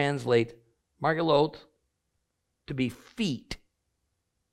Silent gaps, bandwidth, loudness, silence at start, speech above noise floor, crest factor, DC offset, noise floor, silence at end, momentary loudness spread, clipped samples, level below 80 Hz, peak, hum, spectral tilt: none; 13 kHz; -29 LUFS; 0 s; 52 dB; 20 dB; under 0.1%; -79 dBFS; 0.95 s; 14 LU; under 0.1%; -58 dBFS; -10 dBFS; none; -6 dB/octave